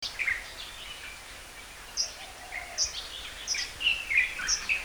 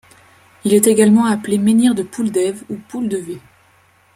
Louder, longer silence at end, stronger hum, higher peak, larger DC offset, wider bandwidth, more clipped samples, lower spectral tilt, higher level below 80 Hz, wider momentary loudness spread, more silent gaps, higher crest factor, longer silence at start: second, -30 LUFS vs -15 LUFS; second, 0 s vs 0.8 s; neither; second, -12 dBFS vs 0 dBFS; neither; first, over 20 kHz vs 16 kHz; neither; second, 1.5 dB/octave vs -5 dB/octave; first, -52 dBFS vs -58 dBFS; about the same, 17 LU vs 17 LU; neither; first, 22 dB vs 16 dB; second, 0 s vs 0.65 s